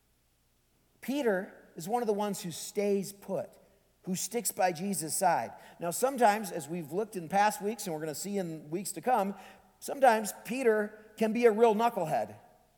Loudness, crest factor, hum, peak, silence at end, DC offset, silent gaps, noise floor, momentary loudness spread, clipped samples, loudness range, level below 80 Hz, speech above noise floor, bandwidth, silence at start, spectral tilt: -31 LUFS; 22 dB; none; -10 dBFS; 0.4 s; under 0.1%; none; -71 dBFS; 13 LU; under 0.1%; 5 LU; -74 dBFS; 40 dB; 19.5 kHz; 1 s; -4 dB/octave